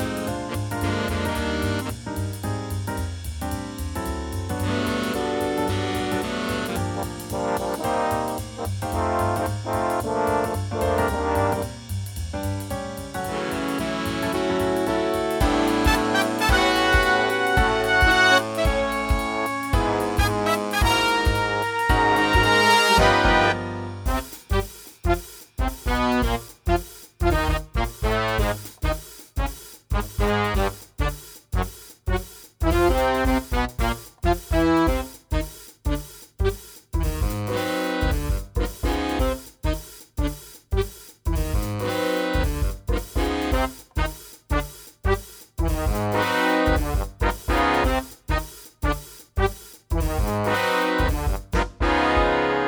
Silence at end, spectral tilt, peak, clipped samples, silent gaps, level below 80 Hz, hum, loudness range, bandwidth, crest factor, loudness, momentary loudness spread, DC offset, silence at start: 0 s; -5 dB/octave; -2 dBFS; under 0.1%; none; -30 dBFS; none; 8 LU; over 20 kHz; 20 dB; -24 LUFS; 11 LU; under 0.1%; 0 s